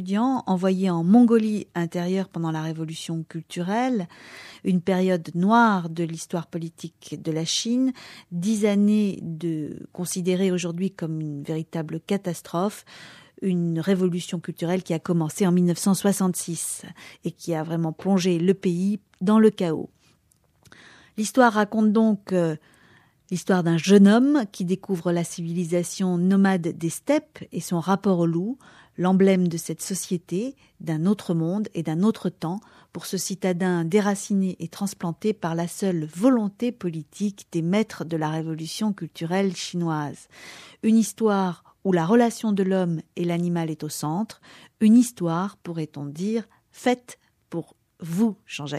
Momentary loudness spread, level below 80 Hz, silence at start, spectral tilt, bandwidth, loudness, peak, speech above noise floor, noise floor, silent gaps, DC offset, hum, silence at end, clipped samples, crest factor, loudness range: 14 LU; -70 dBFS; 0 s; -6 dB/octave; 14.5 kHz; -24 LUFS; -4 dBFS; 41 dB; -64 dBFS; none; under 0.1%; none; 0 s; under 0.1%; 20 dB; 6 LU